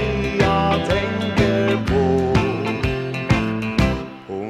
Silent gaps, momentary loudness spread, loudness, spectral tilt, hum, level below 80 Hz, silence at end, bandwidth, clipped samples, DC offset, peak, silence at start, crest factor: none; 5 LU; -20 LUFS; -6.5 dB/octave; none; -32 dBFS; 0 s; 14 kHz; under 0.1%; under 0.1%; -2 dBFS; 0 s; 16 dB